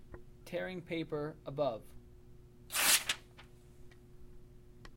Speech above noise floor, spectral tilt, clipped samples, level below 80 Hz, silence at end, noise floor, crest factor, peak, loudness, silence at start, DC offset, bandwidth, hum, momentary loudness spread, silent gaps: 18 dB; -1.5 dB/octave; under 0.1%; -60 dBFS; 0 s; -57 dBFS; 24 dB; -14 dBFS; -34 LUFS; 0 s; under 0.1%; 16.5 kHz; none; 18 LU; none